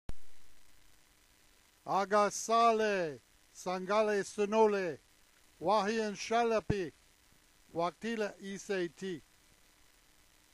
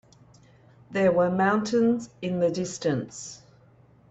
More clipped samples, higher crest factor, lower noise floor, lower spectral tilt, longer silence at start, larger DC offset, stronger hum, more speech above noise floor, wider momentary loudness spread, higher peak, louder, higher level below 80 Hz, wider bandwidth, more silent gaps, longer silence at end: neither; about the same, 20 dB vs 16 dB; first, -66 dBFS vs -56 dBFS; second, -4.5 dB/octave vs -6 dB/octave; second, 0.1 s vs 0.9 s; neither; neither; about the same, 33 dB vs 32 dB; first, 16 LU vs 13 LU; second, -16 dBFS vs -10 dBFS; second, -33 LUFS vs -25 LUFS; about the same, -60 dBFS vs -64 dBFS; first, 14 kHz vs 8.2 kHz; neither; first, 1.35 s vs 0.75 s